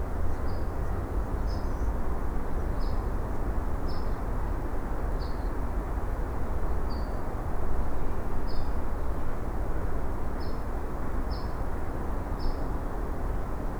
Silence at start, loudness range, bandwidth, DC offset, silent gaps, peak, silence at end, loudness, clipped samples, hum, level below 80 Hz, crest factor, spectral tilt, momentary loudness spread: 0 s; 2 LU; 5.6 kHz; under 0.1%; none; -14 dBFS; 0 s; -34 LUFS; under 0.1%; none; -30 dBFS; 12 dB; -7.5 dB/octave; 2 LU